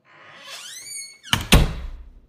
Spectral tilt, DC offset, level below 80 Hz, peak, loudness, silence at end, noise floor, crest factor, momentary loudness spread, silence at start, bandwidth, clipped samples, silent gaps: -4 dB/octave; under 0.1%; -28 dBFS; 0 dBFS; -21 LUFS; 0.2 s; -45 dBFS; 24 dB; 21 LU; 0.45 s; 15.5 kHz; under 0.1%; none